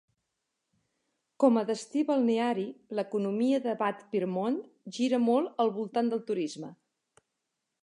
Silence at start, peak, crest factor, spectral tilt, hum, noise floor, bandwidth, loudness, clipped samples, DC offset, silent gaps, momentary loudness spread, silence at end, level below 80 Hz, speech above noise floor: 1.4 s; -10 dBFS; 20 dB; -6 dB/octave; none; -84 dBFS; 11 kHz; -29 LUFS; under 0.1%; under 0.1%; none; 10 LU; 1.1 s; -86 dBFS; 55 dB